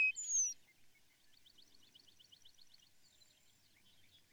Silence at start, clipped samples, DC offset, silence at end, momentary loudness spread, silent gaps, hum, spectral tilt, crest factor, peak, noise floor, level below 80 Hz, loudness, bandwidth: 0 s; under 0.1%; under 0.1%; 1.65 s; 30 LU; none; none; 3.5 dB/octave; 18 dB; -28 dBFS; -70 dBFS; -86 dBFS; -36 LUFS; over 20 kHz